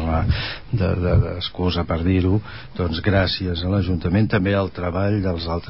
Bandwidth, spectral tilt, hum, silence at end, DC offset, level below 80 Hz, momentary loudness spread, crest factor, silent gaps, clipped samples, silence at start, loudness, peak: 5.8 kHz; -11.5 dB/octave; none; 0 s; 0.8%; -30 dBFS; 6 LU; 14 dB; none; under 0.1%; 0 s; -21 LUFS; -6 dBFS